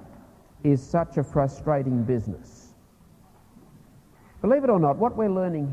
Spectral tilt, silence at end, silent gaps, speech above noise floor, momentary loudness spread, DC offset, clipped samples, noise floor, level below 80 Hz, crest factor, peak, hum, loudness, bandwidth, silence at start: -9.5 dB/octave; 0 s; none; 31 dB; 7 LU; under 0.1%; under 0.1%; -55 dBFS; -50 dBFS; 18 dB; -8 dBFS; none; -24 LUFS; 9.6 kHz; 0 s